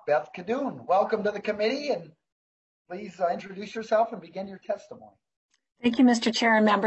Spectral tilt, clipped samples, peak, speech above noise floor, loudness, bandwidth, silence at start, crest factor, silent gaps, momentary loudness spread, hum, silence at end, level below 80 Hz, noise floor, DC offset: -4.5 dB/octave; under 0.1%; -10 dBFS; over 64 dB; -26 LUFS; 8.4 kHz; 0.05 s; 18 dB; 2.32-2.85 s, 5.37-5.49 s; 16 LU; none; 0 s; -72 dBFS; under -90 dBFS; under 0.1%